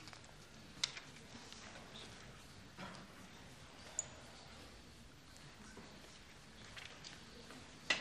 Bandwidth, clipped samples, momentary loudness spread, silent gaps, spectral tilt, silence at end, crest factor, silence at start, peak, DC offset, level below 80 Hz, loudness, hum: 15 kHz; under 0.1%; 15 LU; none; -1.5 dB/octave; 0 s; 34 dB; 0 s; -18 dBFS; under 0.1%; -68 dBFS; -51 LUFS; none